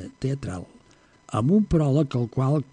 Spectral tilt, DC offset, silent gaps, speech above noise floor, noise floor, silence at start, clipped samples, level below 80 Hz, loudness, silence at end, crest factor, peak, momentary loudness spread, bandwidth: -8.5 dB/octave; under 0.1%; none; 34 dB; -57 dBFS; 0 s; under 0.1%; -46 dBFS; -24 LUFS; 0.1 s; 14 dB; -10 dBFS; 11 LU; 10 kHz